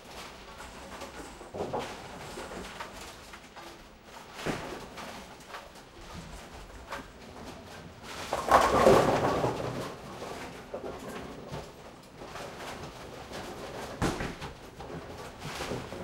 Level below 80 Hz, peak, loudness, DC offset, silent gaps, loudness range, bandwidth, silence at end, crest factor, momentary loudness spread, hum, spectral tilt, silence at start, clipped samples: -52 dBFS; -6 dBFS; -33 LUFS; under 0.1%; none; 14 LU; 16 kHz; 0 s; 28 dB; 20 LU; none; -5 dB/octave; 0 s; under 0.1%